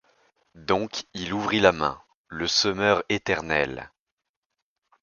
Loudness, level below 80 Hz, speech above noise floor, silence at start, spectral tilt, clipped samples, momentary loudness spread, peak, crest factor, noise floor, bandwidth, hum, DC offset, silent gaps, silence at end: -24 LUFS; -54 dBFS; 61 dB; 0.55 s; -3.5 dB/octave; under 0.1%; 16 LU; -2 dBFS; 24 dB; -85 dBFS; 7.2 kHz; none; under 0.1%; 2.15-2.25 s; 1.15 s